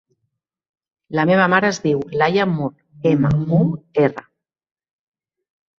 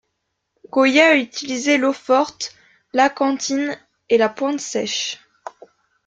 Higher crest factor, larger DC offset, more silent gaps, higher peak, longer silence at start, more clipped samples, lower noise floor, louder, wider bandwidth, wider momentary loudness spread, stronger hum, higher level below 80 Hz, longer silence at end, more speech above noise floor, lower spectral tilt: about the same, 18 dB vs 18 dB; neither; neither; about the same, -2 dBFS vs -2 dBFS; first, 1.1 s vs 0.75 s; neither; about the same, -75 dBFS vs -75 dBFS; about the same, -18 LUFS vs -18 LUFS; second, 7.4 kHz vs 9.2 kHz; second, 9 LU vs 17 LU; neither; first, -52 dBFS vs -68 dBFS; first, 1.6 s vs 0.6 s; about the same, 58 dB vs 57 dB; first, -7 dB/octave vs -2 dB/octave